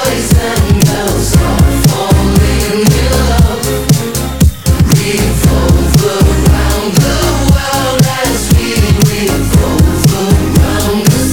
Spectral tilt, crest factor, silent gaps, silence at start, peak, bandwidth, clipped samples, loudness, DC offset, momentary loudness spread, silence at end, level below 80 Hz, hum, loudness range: -5 dB/octave; 10 dB; none; 0 s; 0 dBFS; 20 kHz; 0.3%; -10 LUFS; 2%; 3 LU; 0 s; -14 dBFS; none; 1 LU